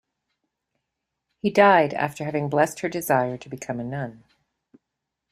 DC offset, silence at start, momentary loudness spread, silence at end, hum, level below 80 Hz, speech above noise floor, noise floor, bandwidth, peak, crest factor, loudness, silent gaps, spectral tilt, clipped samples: under 0.1%; 1.45 s; 16 LU; 1.15 s; none; -64 dBFS; 61 dB; -83 dBFS; 15.5 kHz; -4 dBFS; 22 dB; -22 LUFS; none; -5.5 dB/octave; under 0.1%